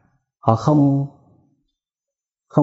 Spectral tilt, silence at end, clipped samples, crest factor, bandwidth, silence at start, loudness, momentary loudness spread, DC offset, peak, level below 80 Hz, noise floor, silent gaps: -10 dB/octave; 0 s; under 0.1%; 20 dB; 7.8 kHz; 0.45 s; -18 LUFS; 8 LU; under 0.1%; 0 dBFS; -58 dBFS; -87 dBFS; none